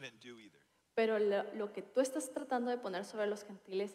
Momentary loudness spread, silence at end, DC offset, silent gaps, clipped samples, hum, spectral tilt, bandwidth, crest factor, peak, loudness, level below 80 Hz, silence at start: 15 LU; 0 s; under 0.1%; none; under 0.1%; none; -4 dB/octave; 14.5 kHz; 16 dB; -22 dBFS; -37 LUFS; -88 dBFS; 0 s